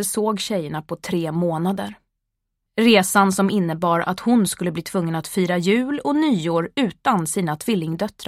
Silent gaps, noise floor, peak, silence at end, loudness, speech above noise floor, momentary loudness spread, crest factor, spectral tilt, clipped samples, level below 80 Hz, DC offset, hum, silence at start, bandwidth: none; -78 dBFS; -2 dBFS; 0.05 s; -21 LUFS; 58 dB; 9 LU; 18 dB; -5 dB/octave; under 0.1%; -58 dBFS; under 0.1%; none; 0 s; 16 kHz